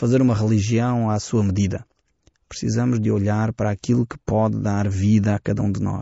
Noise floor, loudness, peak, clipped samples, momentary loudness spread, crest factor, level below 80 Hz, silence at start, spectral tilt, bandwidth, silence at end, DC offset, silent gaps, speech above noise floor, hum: -62 dBFS; -21 LUFS; -8 dBFS; under 0.1%; 6 LU; 12 dB; -46 dBFS; 0 s; -8 dB/octave; 8 kHz; 0 s; under 0.1%; none; 42 dB; none